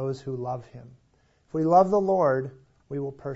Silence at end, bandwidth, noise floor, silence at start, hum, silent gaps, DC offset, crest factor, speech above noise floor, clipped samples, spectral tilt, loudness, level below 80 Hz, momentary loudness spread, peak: 0 s; 8 kHz; -64 dBFS; 0 s; none; none; under 0.1%; 20 dB; 39 dB; under 0.1%; -8.5 dB/octave; -25 LUFS; -62 dBFS; 17 LU; -6 dBFS